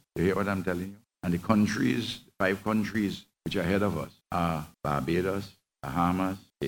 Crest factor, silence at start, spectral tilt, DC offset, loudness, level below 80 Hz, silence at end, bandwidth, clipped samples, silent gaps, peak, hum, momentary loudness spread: 22 dB; 0.15 s; -6.5 dB/octave; under 0.1%; -29 LUFS; -56 dBFS; 0 s; 17.5 kHz; under 0.1%; none; -8 dBFS; none; 10 LU